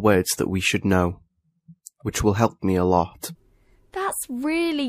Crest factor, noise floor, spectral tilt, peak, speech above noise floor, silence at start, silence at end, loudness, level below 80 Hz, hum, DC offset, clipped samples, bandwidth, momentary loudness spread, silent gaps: 20 dB; -58 dBFS; -5 dB/octave; -4 dBFS; 36 dB; 0 s; 0 s; -23 LUFS; -46 dBFS; none; under 0.1%; under 0.1%; 15.5 kHz; 14 LU; none